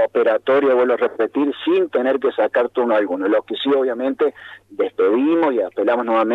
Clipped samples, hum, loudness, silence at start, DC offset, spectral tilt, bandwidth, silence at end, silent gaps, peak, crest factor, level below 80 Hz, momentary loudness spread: under 0.1%; none; -18 LUFS; 0 s; under 0.1%; -6.5 dB/octave; 5 kHz; 0 s; none; -6 dBFS; 12 dB; -68 dBFS; 4 LU